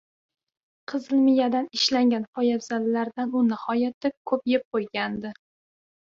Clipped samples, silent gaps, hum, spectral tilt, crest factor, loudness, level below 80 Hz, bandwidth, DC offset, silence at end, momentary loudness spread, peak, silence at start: under 0.1%; 2.28-2.33 s, 3.94-4.01 s, 4.17-4.25 s, 4.65-4.72 s; none; -4.5 dB/octave; 16 dB; -25 LUFS; -70 dBFS; 7.6 kHz; under 0.1%; 0.8 s; 11 LU; -8 dBFS; 0.9 s